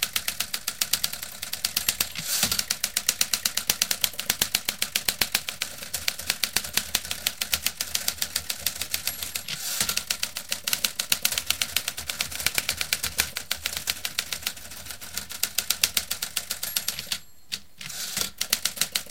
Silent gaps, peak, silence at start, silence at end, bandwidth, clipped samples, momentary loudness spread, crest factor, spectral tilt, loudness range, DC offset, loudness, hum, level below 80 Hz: none; 0 dBFS; 0 s; 0 s; 17 kHz; under 0.1%; 8 LU; 30 dB; 0.5 dB/octave; 4 LU; 0.6%; -26 LUFS; none; -54 dBFS